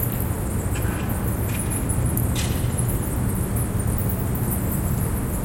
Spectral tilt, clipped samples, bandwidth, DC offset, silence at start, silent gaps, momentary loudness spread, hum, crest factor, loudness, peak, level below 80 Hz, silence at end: -5.5 dB/octave; under 0.1%; 17 kHz; under 0.1%; 0 s; none; 2 LU; none; 16 dB; -24 LUFS; -6 dBFS; -30 dBFS; 0 s